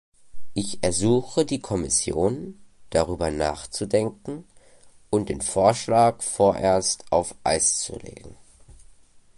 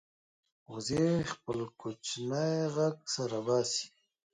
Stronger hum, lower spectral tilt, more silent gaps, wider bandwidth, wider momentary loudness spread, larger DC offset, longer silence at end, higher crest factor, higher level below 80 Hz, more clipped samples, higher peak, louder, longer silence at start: neither; about the same, -4 dB/octave vs -5 dB/octave; neither; about the same, 11.5 kHz vs 10.5 kHz; first, 13 LU vs 10 LU; neither; about the same, 0.45 s vs 0.45 s; about the same, 20 dB vs 16 dB; first, -46 dBFS vs -66 dBFS; neither; first, -4 dBFS vs -18 dBFS; first, -23 LUFS vs -33 LUFS; second, 0.2 s vs 0.7 s